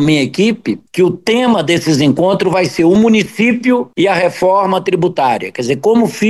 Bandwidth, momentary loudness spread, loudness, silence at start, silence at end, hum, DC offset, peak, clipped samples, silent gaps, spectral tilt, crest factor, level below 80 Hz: 12.5 kHz; 4 LU; -12 LUFS; 0 s; 0 s; none; 0.2%; -2 dBFS; under 0.1%; none; -5.5 dB/octave; 10 dB; -50 dBFS